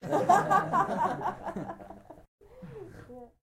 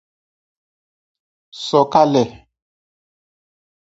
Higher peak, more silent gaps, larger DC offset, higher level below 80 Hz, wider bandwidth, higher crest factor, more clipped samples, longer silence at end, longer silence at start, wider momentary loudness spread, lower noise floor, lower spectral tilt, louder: second, -10 dBFS vs 0 dBFS; first, 2.28-2.38 s vs none; neither; about the same, -60 dBFS vs -60 dBFS; first, 15.5 kHz vs 8 kHz; about the same, 20 dB vs 22 dB; neither; second, 0.15 s vs 1.7 s; second, 0 s vs 1.55 s; first, 24 LU vs 12 LU; second, -49 dBFS vs under -90 dBFS; about the same, -6 dB/octave vs -6 dB/octave; second, -28 LUFS vs -16 LUFS